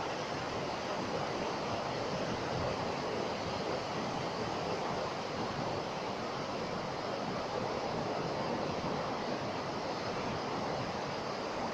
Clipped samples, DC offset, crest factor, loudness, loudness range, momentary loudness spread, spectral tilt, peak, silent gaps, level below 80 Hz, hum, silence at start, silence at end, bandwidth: under 0.1%; under 0.1%; 14 dB; -37 LUFS; 1 LU; 2 LU; -5 dB/octave; -22 dBFS; none; -62 dBFS; none; 0 s; 0 s; 15.5 kHz